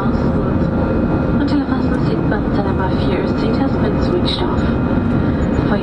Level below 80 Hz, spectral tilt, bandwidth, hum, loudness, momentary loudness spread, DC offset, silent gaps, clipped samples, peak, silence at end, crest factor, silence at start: -26 dBFS; -8.5 dB/octave; 9.4 kHz; none; -17 LUFS; 1 LU; under 0.1%; none; under 0.1%; -2 dBFS; 0 s; 14 dB; 0 s